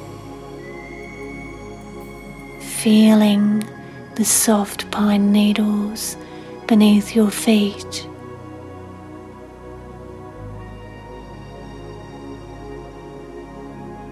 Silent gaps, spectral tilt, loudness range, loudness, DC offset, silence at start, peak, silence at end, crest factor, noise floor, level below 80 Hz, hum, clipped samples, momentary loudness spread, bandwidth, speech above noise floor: none; -4.5 dB/octave; 20 LU; -17 LUFS; under 0.1%; 0 s; -2 dBFS; 0 s; 18 dB; -37 dBFS; -46 dBFS; none; under 0.1%; 23 LU; 14 kHz; 22 dB